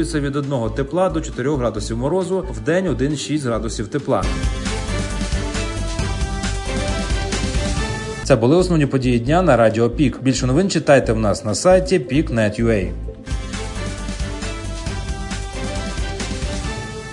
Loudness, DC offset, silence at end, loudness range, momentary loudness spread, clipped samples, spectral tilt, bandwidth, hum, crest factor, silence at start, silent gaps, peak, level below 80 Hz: -20 LUFS; under 0.1%; 0 s; 9 LU; 12 LU; under 0.1%; -5.5 dB/octave; 11 kHz; none; 20 dB; 0 s; none; 0 dBFS; -28 dBFS